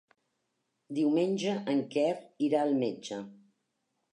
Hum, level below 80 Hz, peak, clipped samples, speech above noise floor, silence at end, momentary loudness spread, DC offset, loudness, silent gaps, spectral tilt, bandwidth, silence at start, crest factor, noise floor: none; -86 dBFS; -16 dBFS; under 0.1%; 51 dB; 0.8 s; 12 LU; under 0.1%; -31 LUFS; none; -6 dB/octave; 10.5 kHz; 0.9 s; 16 dB; -81 dBFS